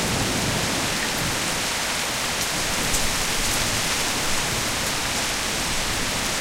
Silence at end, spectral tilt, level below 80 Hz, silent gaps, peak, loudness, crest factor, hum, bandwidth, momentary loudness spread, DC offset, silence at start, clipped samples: 0 s; -2 dB/octave; -36 dBFS; none; -8 dBFS; -22 LUFS; 16 dB; none; 16 kHz; 2 LU; under 0.1%; 0 s; under 0.1%